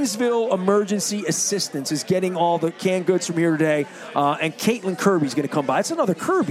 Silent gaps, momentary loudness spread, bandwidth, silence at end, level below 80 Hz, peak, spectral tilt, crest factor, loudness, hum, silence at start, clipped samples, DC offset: none; 3 LU; 16 kHz; 0 s; -72 dBFS; -4 dBFS; -4.5 dB/octave; 16 dB; -21 LUFS; none; 0 s; under 0.1%; under 0.1%